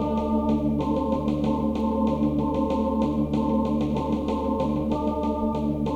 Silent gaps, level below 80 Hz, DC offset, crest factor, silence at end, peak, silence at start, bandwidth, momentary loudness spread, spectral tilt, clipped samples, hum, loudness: none; -38 dBFS; under 0.1%; 12 dB; 0 s; -12 dBFS; 0 s; 7.8 kHz; 2 LU; -9 dB/octave; under 0.1%; none; -25 LUFS